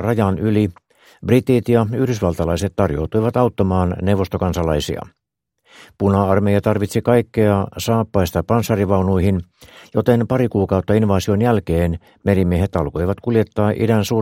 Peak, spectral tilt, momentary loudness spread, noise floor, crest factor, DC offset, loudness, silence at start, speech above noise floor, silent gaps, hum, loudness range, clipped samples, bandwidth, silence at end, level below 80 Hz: 0 dBFS; -7.5 dB/octave; 5 LU; -60 dBFS; 18 dB; under 0.1%; -18 LUFS; 0 s; 43 dB; none; none; 2 LU; under 0.1%; 16.5 kHz; 0 s; -38 dBFS